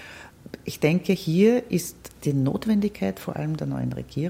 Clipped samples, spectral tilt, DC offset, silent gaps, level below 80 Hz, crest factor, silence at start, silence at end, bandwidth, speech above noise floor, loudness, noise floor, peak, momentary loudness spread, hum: under 0.1%; -6.5 dB/octave; under 0.1%; none; -54 dBFS; 18 dB; 0 s; 0 s; 16.5 kHz; 20 dB; -24 LUFS; -44 dBFS; -6 dBFS; 17 LU; none